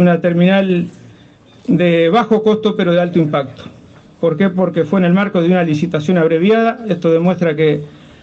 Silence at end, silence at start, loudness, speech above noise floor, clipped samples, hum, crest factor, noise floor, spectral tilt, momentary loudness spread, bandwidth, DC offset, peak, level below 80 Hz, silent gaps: 0.35 s; 0 s; -14 LUFS; 31 dB; under 0.1%; none; 12 dB; -43 dBFS; -8 dB/octave; 7 LU; 7.2 kHz; under 0.1%; -2 dBFS; -56 dBFS; none